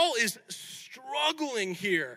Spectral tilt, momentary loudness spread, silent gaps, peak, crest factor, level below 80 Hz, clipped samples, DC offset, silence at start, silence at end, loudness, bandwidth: -2 dB/octave; 13 LU; none; -12 dBFS; 18 dB; -90 dBFS; under 0.1%; under 0.1%; 0 s; 0 s; -30 LUFS; 16.5 kHz